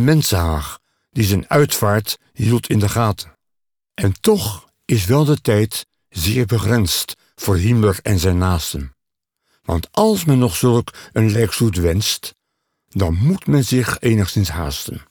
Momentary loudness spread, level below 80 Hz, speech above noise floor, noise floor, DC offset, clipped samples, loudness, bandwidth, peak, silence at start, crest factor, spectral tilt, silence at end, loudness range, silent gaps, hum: 12 LU; -36 dBFS; 64 dB; -81 dBFS; under 0.1%; under 0.1%; -18 LUFS; over 20 kHz; -4 dBFS; 0 s; 14 dB; -5.5 dB/octave; 0.1 s; 2 LU; none; none